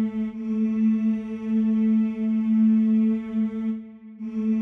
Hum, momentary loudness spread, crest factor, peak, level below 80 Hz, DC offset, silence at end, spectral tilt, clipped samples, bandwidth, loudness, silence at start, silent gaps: none; 10 LU; 10 dB; -14 dBFS; -62 dBFS; under 0.1%; 0 s; -10 dB/octave; under 0.1%; 3.5 kHz; -23 LUFS; 0 s; none